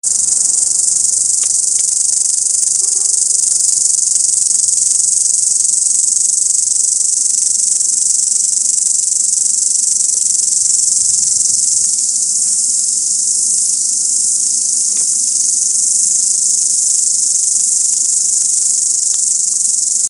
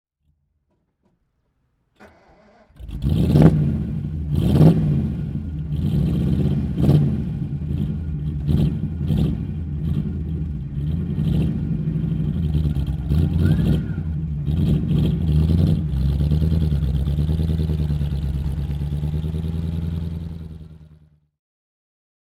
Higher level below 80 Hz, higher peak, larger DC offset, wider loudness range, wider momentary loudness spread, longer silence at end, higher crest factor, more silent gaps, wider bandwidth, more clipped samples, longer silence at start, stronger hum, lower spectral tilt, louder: second, -60 dBFS vs -28 dBFS; about the same, 0 dBFS vs 0 dBFS; neither; second, 1 LU vs 7 LU; second, 1 LU vs 10 LU; second, 0 s vs 1.5 s; second, 14 dB vs 20 dB; neither; first, over 20 kHz vs 11.5 kHz; neither; second, 0.05 s vs 2 s; neither; second, 3 dB/octave vs -9.5 dB/octave; first, -10 LUFS vs -21 LUFS